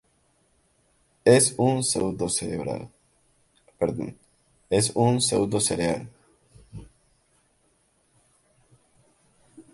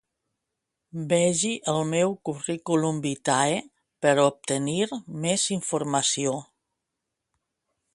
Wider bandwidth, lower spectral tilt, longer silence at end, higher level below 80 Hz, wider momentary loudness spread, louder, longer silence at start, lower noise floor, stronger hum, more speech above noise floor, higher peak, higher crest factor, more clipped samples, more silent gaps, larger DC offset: about the same, 12 kHz vs 11.5 kHz; about the same, -4.5 dB/octave vs -4 dB/octave; second, 0.15 s vs 1.5 s; first, -56 dBFS vs -68 dBFS; first, 27 LU vs 9 LU; about the same, -24 LUFS vs -25 LUFS; first, 1.25 s vs 0.95 s; second, -67 dBFS vs -83 dBFS; neither; second, 43 dB vs 58 dB; about the same, -4 dBFS vs -6 dBFS; about the same, 24 dB vs 20 dB; neither; neither; neither